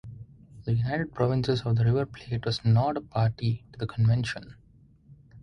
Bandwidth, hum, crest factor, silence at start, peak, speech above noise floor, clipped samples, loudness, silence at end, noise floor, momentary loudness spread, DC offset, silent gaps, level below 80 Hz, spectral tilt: 9.6 kHz; none; 16 dB; 0.05 s; -10 dBFS; 31 dB; under 0.1%; -27 LUFS; 0.05 s; -57 dBFS; 11 LU; under 0.1%; none; -52 dBFS; -7.5 dB/octave